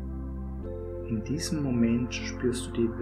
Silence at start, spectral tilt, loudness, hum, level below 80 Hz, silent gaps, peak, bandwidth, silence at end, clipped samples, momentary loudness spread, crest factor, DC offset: 0 s; -6 dB/octave; -31 LUFS; none; -40 dBFS; none; -14 dBFS; 14.5 kHz; 0 s; under 0.1%; 11 LU; 16 dB; under 0.1%